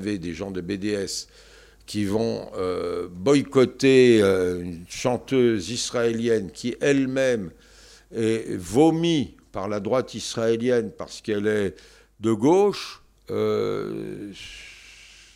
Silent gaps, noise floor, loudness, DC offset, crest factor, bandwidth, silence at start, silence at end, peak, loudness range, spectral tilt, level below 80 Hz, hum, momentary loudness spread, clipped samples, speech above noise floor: none; -51 dBFS; -23 LUFS; under 0.1%; 18 dB; 15 kHz; 0 s; 0.45 s; -6 dBFS; 5 LU; -5.5 dB/octave; -54 dBFS; none; 14 LU; under 0.1%; 28 dB